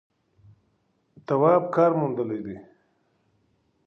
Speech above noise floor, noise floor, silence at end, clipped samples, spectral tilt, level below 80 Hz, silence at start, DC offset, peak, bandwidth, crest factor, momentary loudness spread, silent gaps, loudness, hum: 47 dB; -70 dBFS; 1.25 s; under 0.1%; -10 dB/octave; -68 dBFS; 1.3 s; under 0.1%; -6 dBFS; 6.2 kHz; 20 dB; 20 LU; none; -23 LUFS; none